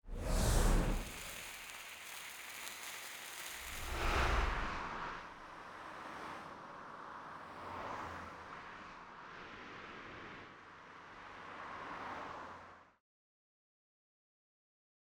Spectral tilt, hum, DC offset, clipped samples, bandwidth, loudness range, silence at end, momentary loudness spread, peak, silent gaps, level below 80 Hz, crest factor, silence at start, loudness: -4 dB/octave; none; under 0.1%; under 0.1%; over 20 kHz; 10 LU; 2.15 s; 16 LU; -20 dBFS; none; -44 dBFS; 22 dB; 0.05 s; -43 LUFS